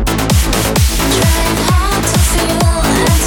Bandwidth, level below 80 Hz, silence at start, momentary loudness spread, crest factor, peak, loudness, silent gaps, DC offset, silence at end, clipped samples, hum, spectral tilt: 18 kHz; -16 dBFS; 0 s; 1 LU; 12 dB; 0 dBFS; -12 LUFS; none; under 0.1%; 0 s; under 0.1%; none; -4 dB/octave